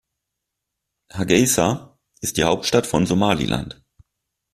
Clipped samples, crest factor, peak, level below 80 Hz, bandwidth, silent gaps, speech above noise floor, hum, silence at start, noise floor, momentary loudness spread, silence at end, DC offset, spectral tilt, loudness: under 0.1%; 20 dB; -2 dBFS; -46 dBFS; 16 kHz; none; 62 dB; none; 1.15 s; -81 dBFS; 12 LU; 0.8 s; under 0.1%; -4 dB/octave; -20 LUFS